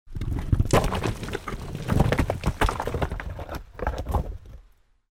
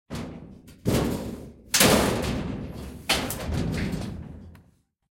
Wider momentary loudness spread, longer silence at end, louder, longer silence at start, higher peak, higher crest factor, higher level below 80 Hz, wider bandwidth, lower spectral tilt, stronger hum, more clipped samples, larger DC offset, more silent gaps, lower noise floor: second, 13 LU vs 21 LU; about the same, 0.5 s vs 0.55 s; about the same, -27 LUFS vs -25 LUFS; about the same, 0.05 s vs 0.1 s; about the same, -6 dBFS vs -4 dBFS; about the same, 20 dB vs 24 dB; first, -32 dBFS vs -40 dBFS; about the same, 17 kHz vs 16.5 kHz; first, -6 dB/octave vs -3.5 dB/octave; neither; neither; neither; neither; second, -56 dBFS vs -61 dBFS